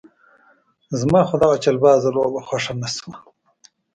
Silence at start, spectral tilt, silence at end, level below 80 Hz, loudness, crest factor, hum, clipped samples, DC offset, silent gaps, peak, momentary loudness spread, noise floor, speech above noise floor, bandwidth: 0.9 s; -5.5 dB/octave; 0.8 s; -52 dBFS; -18 LUFS; 18 dB; none; under 0.1%; under 0.1%; none; -2 dBFS; 13 LU; -58 dBFS; 40 dB; 9.4 kHz